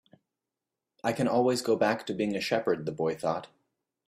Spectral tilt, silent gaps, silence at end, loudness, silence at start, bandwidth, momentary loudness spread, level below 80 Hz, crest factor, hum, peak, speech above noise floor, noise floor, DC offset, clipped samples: -5 dB/octave; none; 0.6 s; -29 LUFS; 1.05 s; 15.5 kHz; 7 LU; -70 dBFS; 18 dB; none; -12 dBFS; 60 dB; -88 dBFS; under 0.1%; under 0.1%